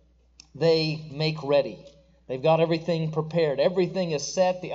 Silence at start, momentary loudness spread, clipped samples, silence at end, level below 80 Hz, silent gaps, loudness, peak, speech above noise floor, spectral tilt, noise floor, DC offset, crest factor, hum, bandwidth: 0.55 s; 6 LU; under 0.1%; 0 s; -60 dBFS; none; -25 LUFS; -10 dBFS; 31 dB; -5.5 dB/octave; -56 dBFS; under 0.1%; 16 dB; none; 7.8 kHz